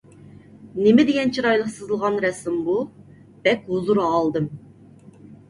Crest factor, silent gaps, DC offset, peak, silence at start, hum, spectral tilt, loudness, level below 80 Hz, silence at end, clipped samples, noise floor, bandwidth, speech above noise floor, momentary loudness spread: 18 dB; none; under 0.1%; -4 dBFS; 0.6 s; none; -6 dB/octave; -21 LUFS; -60 dBFS; 0.15 s; under 0.1%; -47 dBFS; 11.5 kHz; 27 dB; 11 LU